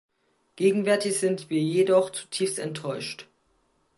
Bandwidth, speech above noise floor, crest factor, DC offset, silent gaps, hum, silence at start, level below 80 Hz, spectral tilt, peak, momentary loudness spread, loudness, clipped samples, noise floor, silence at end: 11.5 kHz; 44 dB; 18 dB; under 0.1%; none; none; 0.55 s; -76 dBFS; -4.5 dB/octave; -10 dBFS; 11 LU; -25 LUFS; under 0.1%; -69 dBFS; 0.75 s